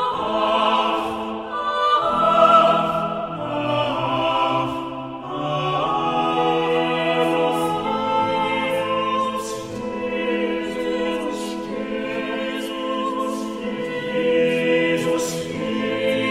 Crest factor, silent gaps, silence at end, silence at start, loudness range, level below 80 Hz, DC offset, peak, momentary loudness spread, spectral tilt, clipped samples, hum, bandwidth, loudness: 18 dB; none; 0 s; 0 s; 6 LU; -54 dBFS; under 0.1%; -4 dBFS; 9 LU; -5 dB/octave; under 0.1%; none; 16 kHz; -21 LUFS